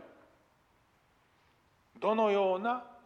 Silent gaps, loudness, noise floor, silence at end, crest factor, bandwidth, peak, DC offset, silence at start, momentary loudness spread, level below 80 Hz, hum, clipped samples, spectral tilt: none; -31 LUFS; -69 dBFS; 0.15 s; 20 dB; 7.6 kHz; -16 dBFS; under 0.1%; 0.05 s; 7 LU; -80 dBFS; none; under 0.1%; -6.5 dB/octave